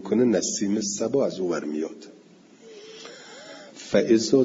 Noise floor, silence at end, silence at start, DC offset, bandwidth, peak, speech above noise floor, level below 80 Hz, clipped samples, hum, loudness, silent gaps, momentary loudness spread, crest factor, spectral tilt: -51 dBFS; 0 s; 0 s; under 0.1%; 7.8 kHz; -6 dBFS; 28 dB; -66 dBFS; under 0.1%; none; -24 LUFS; none; 22 LU; 18 dB; -4.5 dB/octave